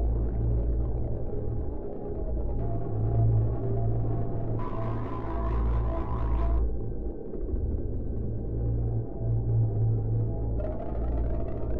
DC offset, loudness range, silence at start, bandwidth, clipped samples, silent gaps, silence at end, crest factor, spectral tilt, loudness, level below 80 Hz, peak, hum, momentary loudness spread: 1%; 2 LU; 0 s; 3 kHz; under 0.1%; none; 0 s; 12 dB; -12 dB/octave; -31 LUFS; -32 dBFS; -14 dBFS; none; 8 LU